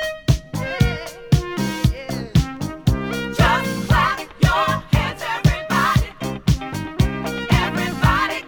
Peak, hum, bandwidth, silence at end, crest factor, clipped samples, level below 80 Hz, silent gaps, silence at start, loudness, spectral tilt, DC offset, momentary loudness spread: -2 dBFS; none; over 20 kHz; 0 s; 18 dB; under 0.1%; -28 dBFS; none; 0 s; -20 LUFS; -5.5 dB/octave; under 0.1%; 7 LU